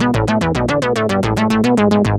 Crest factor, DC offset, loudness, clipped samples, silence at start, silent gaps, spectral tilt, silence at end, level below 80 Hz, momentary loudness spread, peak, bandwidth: 12 dB; under 0.1%; -15 LUFS; under 0.1%; 0 s; none; -6.5 dB/octave; 0 s; -34 dBFS; 3 LU; -2 dBFS; 13.5 kHz